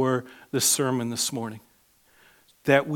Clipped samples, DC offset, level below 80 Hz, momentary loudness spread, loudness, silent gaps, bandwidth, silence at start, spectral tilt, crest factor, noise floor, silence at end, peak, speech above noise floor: under 0.1%; under 0.1%; -72 dBFS; 13 LU; -25 LUFS; none; 19 kHz; 0 s; -3.5 dB/octave; 22 dB; -62 dBFS; 0 s; -4 dBFS; 37 dB